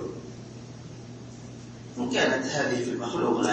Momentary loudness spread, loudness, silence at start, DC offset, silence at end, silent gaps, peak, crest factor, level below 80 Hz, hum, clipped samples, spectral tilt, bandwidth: 18 LU; -27 LUFS; 0 s; under 0.1%; 0 s; none; -12 dBFS; 18 dB; -60 dBFS; none; under 0.1%; -4.5 dB/octave; 8.8 kHz